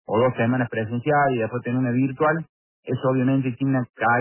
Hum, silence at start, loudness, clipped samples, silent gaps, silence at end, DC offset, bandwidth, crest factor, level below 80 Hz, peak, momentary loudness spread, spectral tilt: none; 0.1 s; -23 LUFS; under 0.1%; 2.49-2.83 s, 3.90-3.94 s; 0 s; under 0.1%; 3.2 kHz; 12 dB; -60 dBFS; -8 dBFS; 6 LU; -11.5 dB/octave